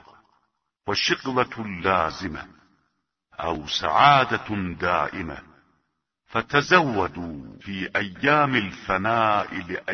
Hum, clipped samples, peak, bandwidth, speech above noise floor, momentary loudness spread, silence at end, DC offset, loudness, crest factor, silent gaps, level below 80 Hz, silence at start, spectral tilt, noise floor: none; under 0.1%; 0 dBFS; 6.6 kHz; 52 dB; 17 LU; 0 s; under 0.1%; -23 LUFS; 24 dB; none; -52 dBFS; 0.85 s; -4.5 dB/octave; -75 dBFS